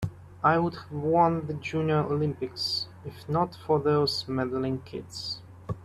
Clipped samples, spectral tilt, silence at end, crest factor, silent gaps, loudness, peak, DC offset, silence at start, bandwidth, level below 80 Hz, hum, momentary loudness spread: under 0.1%; -6.5 dB/octave; 0 s; 20 dB; none; -28 LUFS; -8 dBFS; under 0.1%; 0 s; 13.5 kHz; -58 dBFS; none; 13 LU